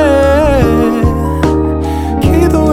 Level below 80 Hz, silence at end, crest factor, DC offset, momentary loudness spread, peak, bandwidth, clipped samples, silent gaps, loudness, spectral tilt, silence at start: -18 dBFS; 0 s; 10 dB; under 0.1%; 5 LU; 0 dBFS; 15.5 kHz; under 0.1%; none; -11 LUFS; -7.5 dB/octave; 0 s